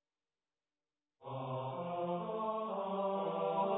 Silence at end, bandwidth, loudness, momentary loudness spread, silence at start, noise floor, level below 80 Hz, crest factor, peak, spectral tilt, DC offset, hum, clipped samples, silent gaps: 0 s; 3.9 kHz; -39 LUFS; 8 LU; 1.2 s; under -90 dBFS; -82 dBFS; 16 dB; -24 dBFS; -5 dB/octave; under 0.1%; none; under 0.1%; none